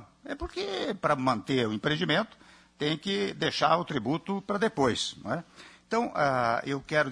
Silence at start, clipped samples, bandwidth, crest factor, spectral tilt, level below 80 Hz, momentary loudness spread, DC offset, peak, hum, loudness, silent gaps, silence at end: 0 s; under 0.1%; 10.5 kHz; 20 dB; -5 dB/octave; -56 dBFS; 9 LU; under 0.1%; -10 dBFS; none; -29 LUFS; none; 0 s